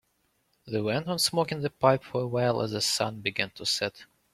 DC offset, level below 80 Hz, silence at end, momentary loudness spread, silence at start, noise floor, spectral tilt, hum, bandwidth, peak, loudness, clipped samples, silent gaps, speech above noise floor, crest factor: under 0.1%; -64 dBFS; 0.3 s; 6 LU; 0.65 s; -73 dBFS; -4 dB/octave; none; 16 kHz; -6 dBFS; -28 LUFS; under 0.1%; none; 45 dB; 22 dB